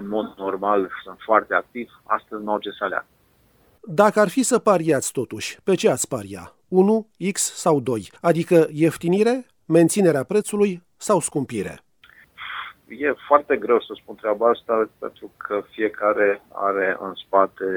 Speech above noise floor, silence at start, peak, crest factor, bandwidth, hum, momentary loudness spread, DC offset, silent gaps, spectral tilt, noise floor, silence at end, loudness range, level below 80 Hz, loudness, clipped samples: 38 dB; 0 s; -2 dBFS; 20 dB; over 20 kHz; none; 13 LU; under 0.1%; none; -5 dB/octave; -59 dBFS; 0 s; 4 LU; -64 dBFS; -21 LUFS; under 0.1%